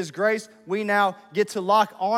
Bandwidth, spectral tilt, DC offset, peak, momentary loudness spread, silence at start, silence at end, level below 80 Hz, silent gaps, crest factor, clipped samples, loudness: 16 kHz; -4.5 dB/octave; under 0.1%; -6 dBFS; 8 LU; 0 s; 0 s; -84 dBFS; none; 16 dB; under 0.1%; -23 LUFS